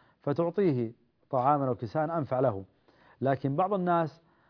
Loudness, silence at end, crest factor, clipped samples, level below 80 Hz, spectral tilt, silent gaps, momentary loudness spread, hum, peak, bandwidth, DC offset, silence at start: -29 LUFS; 0.4 s; 18 dB; under 0.1%; -70 dBFS; -10.5 dB/octave; none; 7 LU; none; -12 dBFS; 5.4 kHz; under 0.1%; 0.25 s